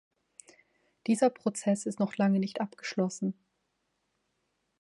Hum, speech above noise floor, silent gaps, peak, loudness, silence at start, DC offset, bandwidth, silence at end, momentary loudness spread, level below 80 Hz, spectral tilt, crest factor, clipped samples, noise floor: none; 50 dB; none; -14 dBFS; -30 LUFS; 1.05 s; under 0.1%; 11.5 kHz; 1.5 s; 9 LU; -78 dBFS; -6 dB/octave; 18 dB; under 0.1%; -79 dBFS